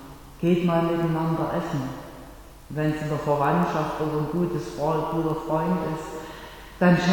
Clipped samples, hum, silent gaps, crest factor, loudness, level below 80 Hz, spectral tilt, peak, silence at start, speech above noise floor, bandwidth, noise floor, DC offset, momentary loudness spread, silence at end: under 0.1%; none; none; 18 dB; -25 LUFS; -48 dBFS; -7.5 dB/octave; -8 dBFS; 0 s; 20 dB; 18.5 kHz; -44 dBFS; under 0.1%; 17 LU; 0 s